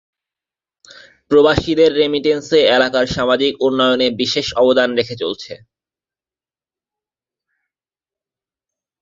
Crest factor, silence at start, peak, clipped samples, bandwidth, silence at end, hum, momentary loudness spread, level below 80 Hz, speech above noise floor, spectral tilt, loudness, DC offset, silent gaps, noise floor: 18 dB; 1.3 s; 0 dBFS; under 0.1%; 7.6 kHz; 3.45 s; none; 9 LU; -46 dBFS; over 75 dB; -4.5 dB/octave; -15 LUFS; under 0.1%; none; under -90 dBFS